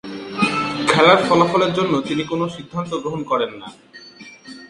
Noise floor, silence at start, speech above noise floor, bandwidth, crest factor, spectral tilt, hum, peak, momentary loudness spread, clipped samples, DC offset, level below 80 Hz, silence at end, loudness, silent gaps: -40 dBFS; 0.05 s; 22 dB; 11.5 kHz; 18 dB; -5 dB/octave; none; 0 dBFS; 19 LU; under 0.1%; under 0.1%; -56 dBFS; 0.05 s; -18 LUFS; none